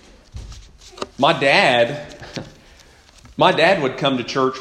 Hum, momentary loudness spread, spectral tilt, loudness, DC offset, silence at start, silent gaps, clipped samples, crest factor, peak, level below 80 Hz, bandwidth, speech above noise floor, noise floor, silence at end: none; 22 LU; -4.5 dB/octave; -16 LUFS; under 0.1%; 0.35 s; none; under 0.1%; 20 dB; 0 dBFS; -46 dBFS; 12 kHz; 31 dB; -48 dBFS; 0 s